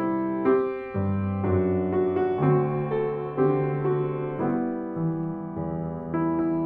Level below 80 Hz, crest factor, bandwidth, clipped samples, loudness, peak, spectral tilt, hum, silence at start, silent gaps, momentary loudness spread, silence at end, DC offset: -56 dBFS; 16 dB; 4 kHz; under 0.1%; -26 LUFS; -10 dBFS; -12 dB/octave; none; 0 s; none; 7 LU; 0 s; under 0.1%